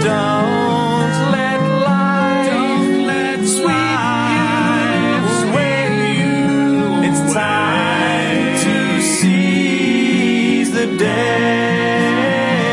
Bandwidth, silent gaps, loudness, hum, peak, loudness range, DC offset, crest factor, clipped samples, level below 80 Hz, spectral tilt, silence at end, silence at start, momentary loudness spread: 11.5 kHz; none; -15 LUFS; none; -2 dBFS; 1 LU; under 0.1%; 12 dB; under 0.1%; -56 dBFS; -5 dB/octave; 0 s; 0 s; 2 LU